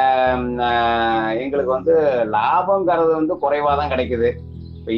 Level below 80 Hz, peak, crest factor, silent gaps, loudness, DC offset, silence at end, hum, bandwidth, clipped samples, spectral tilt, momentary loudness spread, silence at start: -44 dBFS; -6 dBFS; 12 dB; none; -18 LUFS; under 0.1%; 0 s; none; 5.8 kHz; under 0.1%; -8 dB/octave; 5 LU; 0 s